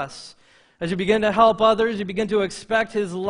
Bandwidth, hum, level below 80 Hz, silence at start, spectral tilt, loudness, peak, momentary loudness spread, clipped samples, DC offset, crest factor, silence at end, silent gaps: 10.5 kHz; none; -54 dBFS; 0 s; -5 dB/octave; -20 LUFS; -2 dBFS; 14 LU; under 0.1%; under 0.1%; 20 dB; 0 s; none